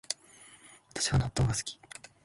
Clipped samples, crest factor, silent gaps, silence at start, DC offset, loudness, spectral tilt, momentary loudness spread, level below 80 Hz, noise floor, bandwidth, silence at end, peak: under 0.1%; 24 dB; none; 0.1 s; under 0.1%; -31 LUFS; -4 dB/octave; 23 LU; -46 dBFS; -56 dBFS; 11.5 kHz; 0.5 s; -10 dBFS